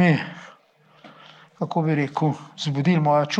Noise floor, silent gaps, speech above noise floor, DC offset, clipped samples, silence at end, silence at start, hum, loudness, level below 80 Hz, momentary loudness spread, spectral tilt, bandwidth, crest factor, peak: -57 dBFS; none; 35 dB; under 0.1%; under 0.1%; 0 s; 0 s; none; -23 LUFS; -72 dBFS; 13 LU; -7 dB/octave; 8.4 kHz; 16 dB; -6 dBFS